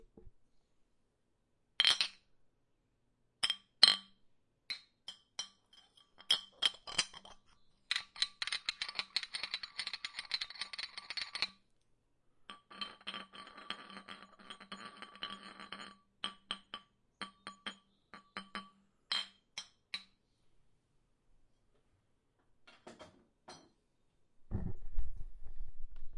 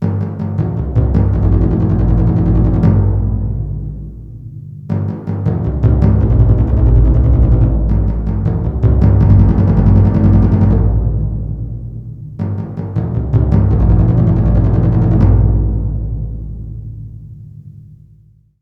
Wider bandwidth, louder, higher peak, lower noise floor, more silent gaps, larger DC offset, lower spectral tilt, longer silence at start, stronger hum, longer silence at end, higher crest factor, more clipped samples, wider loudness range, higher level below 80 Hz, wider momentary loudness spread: first, 11.5 kHz vs 2.8 kHz; second, -37 LUFS vs -13 LUFS; second, -6 dBFS vs 0 dBFS; first, -79 dBFS vs -46 dBFS; neither; neither; second, -0.5 dB/octave vs -12 dB/octave; first, 0.15 s vs 0 s; neither; second, 0 s vs 0.65 s; first, 36 dB vs 12 dB; neither; first, 17 LU vs 5 LU; second, -54 dBFS vs -16 dBFS; first, 22 LU vs 17 LU